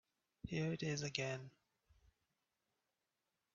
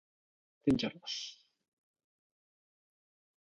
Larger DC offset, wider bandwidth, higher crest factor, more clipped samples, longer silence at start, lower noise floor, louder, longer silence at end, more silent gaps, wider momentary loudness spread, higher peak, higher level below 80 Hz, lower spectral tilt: neither; second, 7.4 kHz vs 10.5 kHz; about the same, 26 dB vs 24 dB; neither; second, 0.45 s vs 0.65 s; about the same, -90 dBFS vs under -90 dBFS; second, -43 LUFS vs -35 LUFS; about the same, 2.05 s vs 2.05 s; neither; first, 14 LU vs 9 LU; second, -22 dBFS vs -16 dBFS; second, -72 dBFS vs -64 dBFS; about the same, -5 dB/octave vs -5 dB/octave